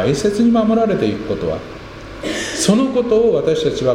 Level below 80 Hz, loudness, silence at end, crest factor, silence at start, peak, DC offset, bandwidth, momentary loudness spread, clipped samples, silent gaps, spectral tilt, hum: -40 dBFS; -16 LUFS; 0 s; 14 dB; 0 s; -2 dBFS; under 0.1%; 15 kHz; 13 LU; under 0.1%; none; -5 dB/octave; none